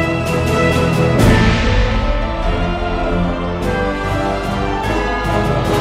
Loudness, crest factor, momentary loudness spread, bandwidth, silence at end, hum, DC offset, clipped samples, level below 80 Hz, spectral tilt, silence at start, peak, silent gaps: -16 LUFS; 14 dB; 7 LU; 15.5 kHz; 0 s; none; under 0.1%; under 0.1%; -22 dBFS; -6 dB/octave; 0 s; 0 dBFS; none